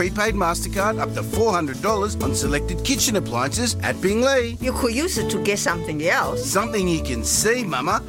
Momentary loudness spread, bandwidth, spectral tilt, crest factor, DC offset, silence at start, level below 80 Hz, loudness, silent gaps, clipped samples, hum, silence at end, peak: 4 LU; 17 kHz; -3.5 dB/octave; 16 dB; under 0.1%; 0 s; -34 dBFS; -21 LUFS; none; under 0.1%; none; 0 s; -6 dBFS